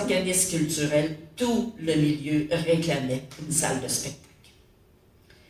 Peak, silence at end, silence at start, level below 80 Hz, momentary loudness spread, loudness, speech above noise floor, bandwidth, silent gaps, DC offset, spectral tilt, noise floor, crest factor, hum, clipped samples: -10 dBFS; 1.3 s; 0 s; -54 dBFS; 8 LU; -26 LUFS; 32 dB; 16 kHz; none; under 0.1%; -4 dB/octave; -58 dBFS; 18 dB; none; under 0.1%